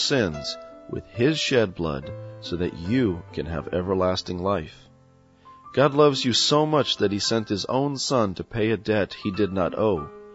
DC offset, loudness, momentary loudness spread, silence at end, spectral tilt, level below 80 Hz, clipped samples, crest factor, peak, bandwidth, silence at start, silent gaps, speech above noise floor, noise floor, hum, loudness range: under 0.1%; -24 LUFS; 13 LU; 0 s; -4.5 dB/octave; -50 dBFS; under 0.1%; 18 dB; -6 dBFS; 8 kHz; 0 s; none; 32 dB; -55 dBFS; none; 5 LU